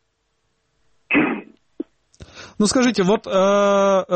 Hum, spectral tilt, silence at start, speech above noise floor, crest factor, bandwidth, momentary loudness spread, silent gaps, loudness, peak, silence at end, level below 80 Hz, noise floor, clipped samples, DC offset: none; -4.5 dB/octave; 1.1 s; 53 dB; 14 dB; 8.4 kHz; 20 LU; none; -18 LUFS; -6 dBFS; 0 s; -54 dBFS; -69 dBFS; under 0.1%; under 0.1%